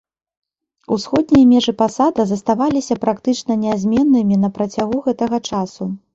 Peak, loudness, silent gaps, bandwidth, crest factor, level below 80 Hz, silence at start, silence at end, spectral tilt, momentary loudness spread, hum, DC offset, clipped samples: -2 dBFS; -17 LUFS; none; 8 kHz; 14 dB; -50 dBFS; 0.9 s; 0.2 s; -6 dB/octave; 10 LU; none; under 0.1%; under 0.1%